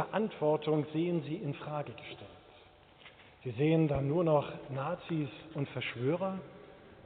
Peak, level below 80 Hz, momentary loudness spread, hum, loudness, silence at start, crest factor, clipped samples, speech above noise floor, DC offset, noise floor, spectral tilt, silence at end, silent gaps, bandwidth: -16 dBFS; -62 dBFS; 19 LU; none; -34 LUFS; 0 s; 18 dB; under 0.1%; 26 dB; under 0.1%; -59 dBFS; -6.5 dB/octave; 0.05 s; none; 4.5 kHz